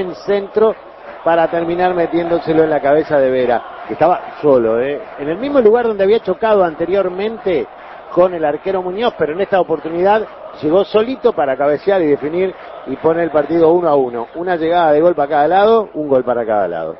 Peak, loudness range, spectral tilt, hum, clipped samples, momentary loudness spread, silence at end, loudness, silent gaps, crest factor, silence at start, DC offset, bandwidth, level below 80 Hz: 0 dBFS; 3 LU; -8.5 dB/octave; none; under 0.1%; 9 LU; 0 s; -15 LUFS; none; 14 dB; 0 s; under 0.1%; 6 kHz; -50 dBFS